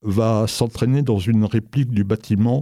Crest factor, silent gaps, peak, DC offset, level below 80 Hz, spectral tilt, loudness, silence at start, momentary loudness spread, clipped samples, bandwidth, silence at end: 14 dB; none; -6 dBFS; under 0.1%; -50 dBFS; -7 dB/octave; -20 LUFS; 0.05 s; 3 LU; under 0.1%; 15 kHz; 0 s